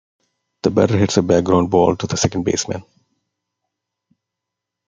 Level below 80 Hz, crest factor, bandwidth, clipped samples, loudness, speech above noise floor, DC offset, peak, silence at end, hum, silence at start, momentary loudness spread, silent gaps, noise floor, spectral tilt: -52 dBFS; 18 dB; 9.6 kHz; under 0.1%; -17 LUFS; 66 dB; under 0.1%; 0 dBFS; 2.05 s; 60 Hz at -45 dBFS; 0.65 s; 8 LU; none; -82 dBFS; -5.5 dB/octave